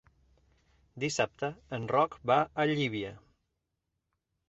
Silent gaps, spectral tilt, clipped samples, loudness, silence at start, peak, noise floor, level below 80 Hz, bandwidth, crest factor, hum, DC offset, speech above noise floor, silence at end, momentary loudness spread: none; -5 dB/octave; under 0.1%; -31 LUFS; 0.95 s; -12 dBFS; -84 dBFS; -66 dBFS; 8.2 kHz; 22 dB; none; under 0.1%; 53 dB; 1.3 s; 11 LU